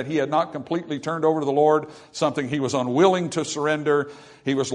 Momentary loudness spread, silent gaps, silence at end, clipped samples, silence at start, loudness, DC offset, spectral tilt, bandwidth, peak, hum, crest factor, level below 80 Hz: 9 LU; none; 0 s; under 0.1%; 0 s; -23 LUFS; under 0.1%; -5 dB/octave; 10.5 kHz; -4 dBFS; none; 20 dB; -66 dBFS